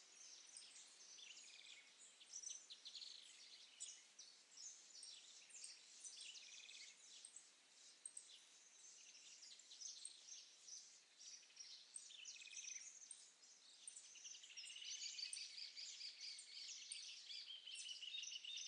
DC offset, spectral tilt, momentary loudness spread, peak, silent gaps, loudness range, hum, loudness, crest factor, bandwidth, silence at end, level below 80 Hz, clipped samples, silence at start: under 0.1%; 4.5 dB/octave; 12 LU; -38 dBFS; none; 7 LU; none; -56 LUFS; 22 dB; 11 kHz; 0 s; under -90 dBFS; under 0.1%; 0 s